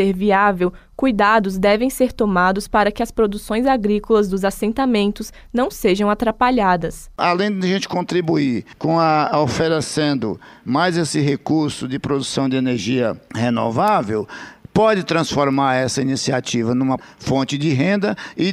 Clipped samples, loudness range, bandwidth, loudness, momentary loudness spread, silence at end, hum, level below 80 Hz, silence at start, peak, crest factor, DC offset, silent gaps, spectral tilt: under 0.1%; 2 LU; 16 kHz; -18 LUFS; 7 LU; 0 s; none; -42 dBFS; 0 s; -4 dBFS; 14 dB; under 0.1%; none; -5.5 dB/octave